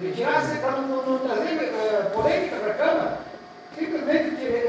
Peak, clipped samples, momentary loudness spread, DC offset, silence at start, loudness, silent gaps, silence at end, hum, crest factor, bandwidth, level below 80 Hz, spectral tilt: -8 dBFS; under 0.1%; 9 LU; under 0.1%; 0 s; -24 LUFS; none; 0 s; none; 16 dB; 8 kHz; -58 dBFS; -5.5 dB/octave